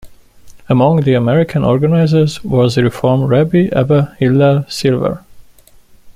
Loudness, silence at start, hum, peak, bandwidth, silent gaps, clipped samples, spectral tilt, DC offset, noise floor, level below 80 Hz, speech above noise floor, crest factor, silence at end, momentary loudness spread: -13 LUFS; 0.05 s; none; -2 dBFS; 14.5 kHz; none; under 0.1%; -7.5 dB/octave; under 0.1%; -43 dBFS; -42 dBFS; 32 dB; 12 dB; 0.05 s; 4 LU